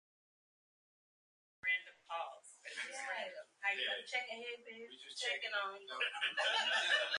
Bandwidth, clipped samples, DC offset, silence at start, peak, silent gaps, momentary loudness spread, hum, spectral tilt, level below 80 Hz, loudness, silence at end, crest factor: 11 kHz; under 0.1%; under 0.1%; 1.65 s; -22 dBFS; none; 15 LU; none; 1.5 dB/octave; under -90 dBFS; -39 LUFS; 0 s; 20 dB